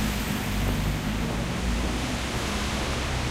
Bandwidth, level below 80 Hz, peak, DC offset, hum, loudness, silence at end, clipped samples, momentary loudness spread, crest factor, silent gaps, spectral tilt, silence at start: 16 kHz; -32 dBFS; -14 dBFS; under 0.1%; none; -28 LUFS; 0 s; under 0.1%; 1 LU; 12 dB; none; -4.5 dB/octave; 0 s